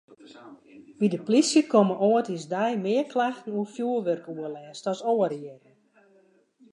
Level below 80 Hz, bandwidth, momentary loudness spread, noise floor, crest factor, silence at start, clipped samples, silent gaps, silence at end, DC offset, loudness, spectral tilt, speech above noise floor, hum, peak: -82 dBFS; 11 kHz; 14 LU; -62 dBFS; 20 dB; 0.1 s; under 0.1%; none; 1.15 s; under 0.1%; -25 LUFS; -5 dB/octave; 36 dB; none; -6 dBFS